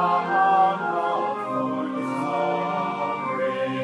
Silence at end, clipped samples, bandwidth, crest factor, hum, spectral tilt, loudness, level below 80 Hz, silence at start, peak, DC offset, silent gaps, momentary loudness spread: 0 s; under 0.1%; 11 kHz; 14 dB; none; -6.5 dB/octave; -24 LUFS; -78 dBFS; 0 s; -10 dBFS; under 0.1%; none; 7 LU